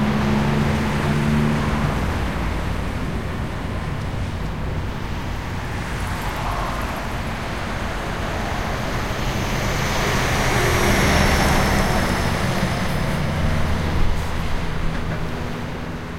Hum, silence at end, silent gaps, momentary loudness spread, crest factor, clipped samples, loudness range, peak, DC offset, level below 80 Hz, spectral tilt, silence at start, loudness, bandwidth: none; 0 s; none; 9 LU; 16 dB; under 0.1%; 8 LU; -4 dBFS; 1%; -28 dBFS; -5 dB/octave; 0 s; -22 LUFS; 16 kHz